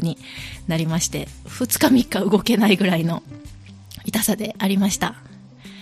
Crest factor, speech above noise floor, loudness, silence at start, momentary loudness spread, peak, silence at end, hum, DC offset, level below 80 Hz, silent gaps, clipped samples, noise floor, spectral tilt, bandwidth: 20 dB; 22 dB; -20 LUFS; 0 s; 17 LU; -2 dBFS; 0 s; none; under 0.1%; -46 dBFS; none; under 0.1%; -42 dBFS; -4.5 dB/octave; 15.5 kHz